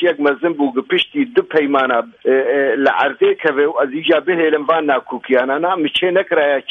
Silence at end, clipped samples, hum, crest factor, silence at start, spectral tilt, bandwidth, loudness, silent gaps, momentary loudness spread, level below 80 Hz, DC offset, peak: 0.1 s; under 0.1%; none; 14 dB; 0 s; -6 dB/octave; 9.4 kHz; -16 LUFS; none; 3 LU; -64 dBFS; under 0.1%; -2 dBFS